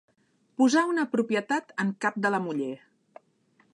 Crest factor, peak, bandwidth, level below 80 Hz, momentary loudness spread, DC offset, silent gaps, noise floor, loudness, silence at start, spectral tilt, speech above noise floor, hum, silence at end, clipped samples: 16 dB; -12 dBFS; 11 kHz; -82 dBFS; 12 LU; under 0.1%; none; -66 dBFS; -27 LUFS; 0.6 s; -5 dB/octave; 40 dB; none; 1 s; under 0.1%